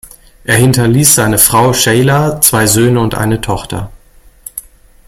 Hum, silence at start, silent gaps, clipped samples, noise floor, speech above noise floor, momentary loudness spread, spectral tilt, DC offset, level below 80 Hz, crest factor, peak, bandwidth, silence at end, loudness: none; 0.05 s; none; 0.3%; -42 dBFS; 32 dB; 19 LU; -4 dB/octave; under 0.1%; -34 dBFS; 12 dB; 0 dBFS; over 20 kHz; 0.45 s; -9 LUFS